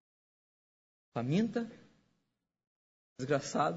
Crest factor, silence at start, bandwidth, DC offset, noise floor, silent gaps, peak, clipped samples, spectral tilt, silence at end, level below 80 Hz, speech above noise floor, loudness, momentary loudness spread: 20 dB; 1.15 s; 7.6 kHz; under 0.1%; -83 dBFS; 2.67-3.16 s; -18 dBFS; under 0.1%; -6 dB/octave; 0 s; -76 dBFS; 51 dB; -35 LUFS; 12 LU